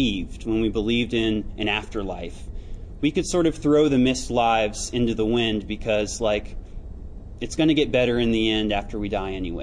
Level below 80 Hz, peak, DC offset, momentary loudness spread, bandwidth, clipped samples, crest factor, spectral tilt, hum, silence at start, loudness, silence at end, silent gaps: -36 dBFS; -8 dBFS; under 0.1%; 20 LU; 10.5 kHz; under 0.1%; 16 dB; -5 dB/octave; none; 0 s; -23 LUFS; 0 s; none